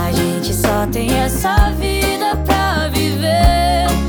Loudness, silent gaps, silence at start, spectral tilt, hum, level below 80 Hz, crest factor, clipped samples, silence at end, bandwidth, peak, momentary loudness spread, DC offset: -16 LUFS; none; 0 s; -5 dB/octave; none; -20 dBFS; 12 dB; under 0.1%; 0 s; over 20 kHz; -2 dBFS; 4 LU; under 0.1%